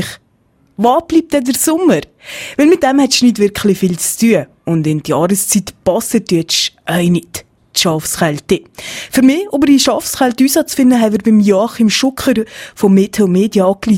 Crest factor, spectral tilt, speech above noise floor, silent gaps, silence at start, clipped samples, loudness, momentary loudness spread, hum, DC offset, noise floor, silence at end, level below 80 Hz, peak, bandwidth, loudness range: 12 dB; -4.5 dB/octave; 42 dB; none; 0 s; under 0.1%; -12 LUFS; 7 LU; none; under 0.1%; -54 dBFS; 0 s; -46 dBFS; 0 dBFS; 17 kHz; 3 LU